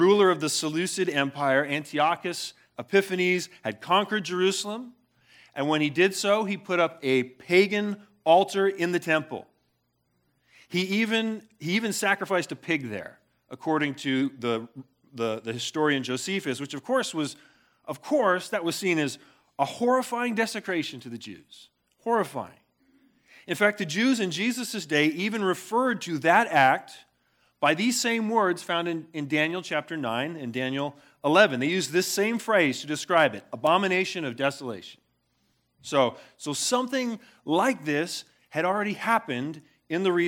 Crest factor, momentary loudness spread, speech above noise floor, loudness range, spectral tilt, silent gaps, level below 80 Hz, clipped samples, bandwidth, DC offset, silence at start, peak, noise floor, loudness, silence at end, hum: 22 dB; 13 LU; 47 dB; 5 LU; -4 dB/octave; none; -80 dBFS; under 0.1%; 18.5 kHz; under 0.1%; 0 s; -4 dBFS; -73 dBFS; -26 LUFS; 0 s; none